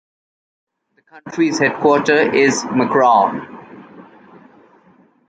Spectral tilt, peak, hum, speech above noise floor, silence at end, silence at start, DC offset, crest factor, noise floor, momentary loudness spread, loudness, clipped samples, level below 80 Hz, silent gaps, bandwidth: -4.5 dB/octave; -2 dBFS; none; 37 dB; 1.25 s; 1.15 s; under 0.1%; 16 dB; -52 dBFS; 13 LU; -15 LUFS; under 0.1%; -62 dBFS; none; 9.2 kHz